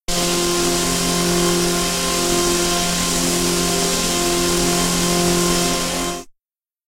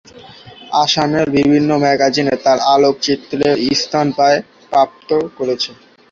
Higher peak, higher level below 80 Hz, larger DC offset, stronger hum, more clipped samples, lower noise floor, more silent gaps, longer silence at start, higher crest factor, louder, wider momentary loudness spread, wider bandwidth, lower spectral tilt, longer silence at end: second, -4 dBFS vs 0 dBFS; first, -34 dBFS vs -52 dBFS; neither; neither; neither; first, -84 dBFS vs -38 dBFS; neither; about the same, 0.1 s vs 0.15 s; about the same, 16 dB vs 14 dB; about the same, -17 LUFS vs -15 LUFS; second, 2 LU vs 6 LU; first, 16 kHz vs 7.6 kHz; second, -3 dB/octave vs -4.5 dB/octave; first, 0.6 s vs 0.4 s